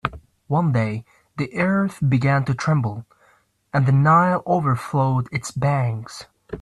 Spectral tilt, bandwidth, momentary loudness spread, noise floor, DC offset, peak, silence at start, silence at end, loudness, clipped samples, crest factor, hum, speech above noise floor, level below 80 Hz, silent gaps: -7.5 dB/octave; 12 kHz; 16 LU; -60 dBFS; under 0.1%; -4 dBFS; 0.05 s; 0 s; -21 LUFS; under 0.1%; 16 dB; none; 40 dB; -52 dBFS; none